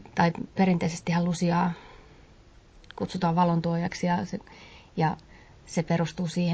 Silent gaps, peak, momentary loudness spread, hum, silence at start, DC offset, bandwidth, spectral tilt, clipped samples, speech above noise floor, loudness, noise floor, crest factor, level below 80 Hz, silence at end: none; -10 dBFS; 15 LU; none; 0 s; under 0.1%; 8 kHz; -6.5 dB/octave; under 0.1%; 28 dB; -27 LUFS; -54 dBFS; 18 dB; -54 dBFS; 0 s